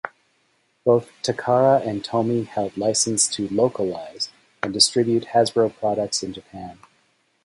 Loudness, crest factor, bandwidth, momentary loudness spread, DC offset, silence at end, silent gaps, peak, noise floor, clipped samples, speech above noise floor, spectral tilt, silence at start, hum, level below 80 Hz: -21 LUFS; 20 dB; 11.5 kHz; 13 LU; under 0.1%; 0.7 s; none; -4 dBFS; -66 dBFS; under 0.1%; 44 dB; -3.5 dB/octave; 0.05 s; none; -60 dBFS